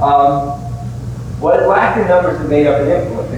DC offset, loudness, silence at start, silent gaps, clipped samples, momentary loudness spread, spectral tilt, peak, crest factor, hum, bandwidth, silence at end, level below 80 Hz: under 0.1%; -13 LUFS; 0 s; none; under 0.1%; 13 LU; -7.5 dB/octave; 0 dBFS; 12 dB; none; 11 kHz; 0 s; -34 dBFS